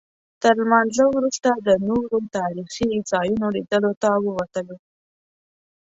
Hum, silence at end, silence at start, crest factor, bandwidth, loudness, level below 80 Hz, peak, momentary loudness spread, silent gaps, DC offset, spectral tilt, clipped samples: none; 1.15 s; 0.4 s; 18 dB; 8 kHz; -21 LUFS; -56 dBFS; -4 dBFS; 9 LU; 3.97-4.01 s; under 0.1%; -5 dB/octave; under 0.1%